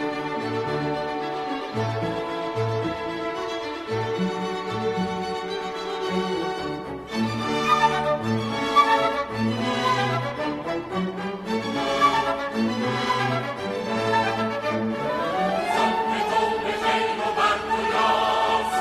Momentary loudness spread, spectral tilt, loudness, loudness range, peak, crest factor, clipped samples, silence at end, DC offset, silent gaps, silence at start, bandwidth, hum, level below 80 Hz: 8 LU; -5 dB/octave; -24 LUFS; 5 LU; -6 dBFS; 18 dB; under 0.1%; 0 s; under 0.1%; none; 0 s; 14.5 kHz; none; -54 dBFS